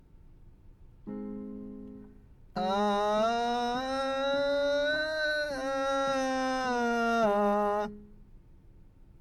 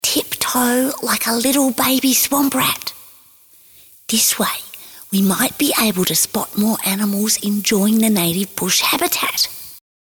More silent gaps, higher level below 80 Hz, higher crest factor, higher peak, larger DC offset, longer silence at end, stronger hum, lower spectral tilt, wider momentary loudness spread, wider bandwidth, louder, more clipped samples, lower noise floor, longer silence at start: neither; about the same, -54 dBFS vs -56 dBFS; about the same, 14 dB vs 14 dB; second, -16 dBFS vs -4 dBFS; neither; second, 0 s vs 0.25 s; neither; first, -4.5 dB/octave vs -2.5 dB/octave; first, 16 LU vs 7 LU; second, 13 kHz vs over 20 kHz; second, -29 LUFS vs -16 LUFS; neither; first, -54 dBFS vs -48 dBFS; first, 0.2 s vs 0.05 s